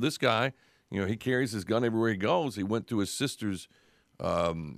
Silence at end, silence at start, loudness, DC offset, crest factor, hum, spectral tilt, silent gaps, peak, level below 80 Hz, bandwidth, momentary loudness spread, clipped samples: 0.05 s; 0 s; -30 LUFS; under 0.1%; 20 dB; none; -5 dB/octave; none; -10 dBFS; -60 dBFS; 15.5 kHz; 9 LU; under 0.1%